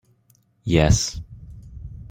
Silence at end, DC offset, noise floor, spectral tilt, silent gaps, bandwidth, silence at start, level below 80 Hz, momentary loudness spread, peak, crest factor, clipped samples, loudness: 0.05 s; under 0.1%; -61 dBFS; -5 dB/octave; none; 16 kHz; 0.65 s; -34 dBFS; 24 LU; -2 dBFS; 22 dB; under 0.1%; -20 LUFS